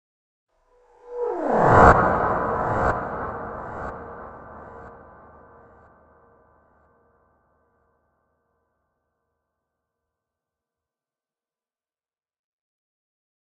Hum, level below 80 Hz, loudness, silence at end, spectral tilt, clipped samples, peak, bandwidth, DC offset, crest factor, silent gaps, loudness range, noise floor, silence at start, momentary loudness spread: none; -42 dBFS; -20 LUFS; 8.45 s; -8 dB/octave; under 0.1%; 0 dBFS; 9 kHz; under 0.1%; 26 dB; none; 21 LU; under -90 dBFS; 1.05 s; 28 LU